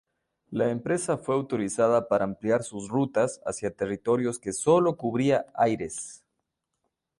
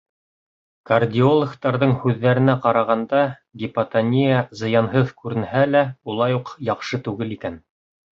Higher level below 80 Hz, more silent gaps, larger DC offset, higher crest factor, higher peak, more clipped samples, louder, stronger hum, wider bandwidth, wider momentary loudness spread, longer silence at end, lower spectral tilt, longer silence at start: second, -62 dBFS vs -56 dBFS; neither; neither; about the same, 18 dB vs 18 dB; second, -8 dBFS vs -2 dBFS; neither; second, -27 LUFS vs -20 LUFS; neither; first, 11.5 kHz vs 7.2 kHz; about the same, 9 LU vs 10 LU; first, 1.05 s vs 0.6 s; second, -5.5 dB/octave vs -8 dB/octave; second, 0.5 s vs 0.9 s